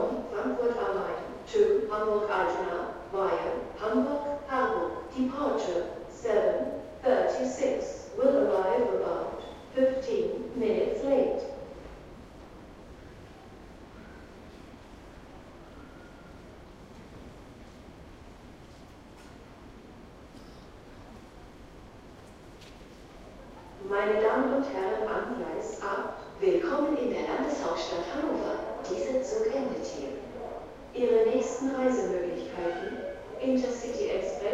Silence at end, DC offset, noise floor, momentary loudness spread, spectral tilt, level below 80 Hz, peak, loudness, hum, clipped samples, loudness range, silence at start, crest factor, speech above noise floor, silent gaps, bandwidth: 0 s; under 0.1%; -50 dBFS; 23 LU; -5 dB/octave; -56 dBFS; -12 dBFS; -30 LUFS; none; under 0.1%; 21 LU; 0 s; 20 dB; 21 dB; none; 11 kHz